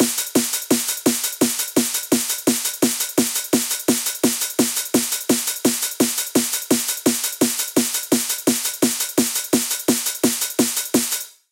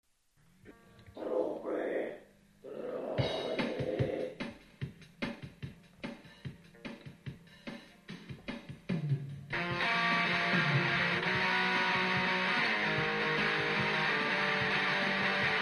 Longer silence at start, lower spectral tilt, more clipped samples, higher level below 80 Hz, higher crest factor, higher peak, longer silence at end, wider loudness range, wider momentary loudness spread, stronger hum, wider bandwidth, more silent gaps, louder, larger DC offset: second, 0 s vs 0.65 s; second, -2 dB/octave vs -5 dB/octave; neither; about the same, -66 dBFS vs -64 dBFS; about the same, 18 dB vs 16 dB; first, -4 dBFS vs -18 dBFS; first, 0.2 s vs 0 s; second, 0 LU vs 17 LU; second, 1 LU vs 19 LU; neither; first, 17 kHz vs 13 kHz; neither; first, -19 LUFS vs -31 LUFS; neither